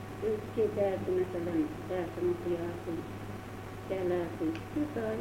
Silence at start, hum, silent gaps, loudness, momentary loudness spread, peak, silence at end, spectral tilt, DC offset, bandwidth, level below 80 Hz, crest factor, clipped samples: 0 s; none; none; -34 LUFS; 11 LU; -18 dBFS; 0 s; -7.5 dB/octave; under 0.1%; 16 kHz; -56 dBFS; 16 dB; under 0.1%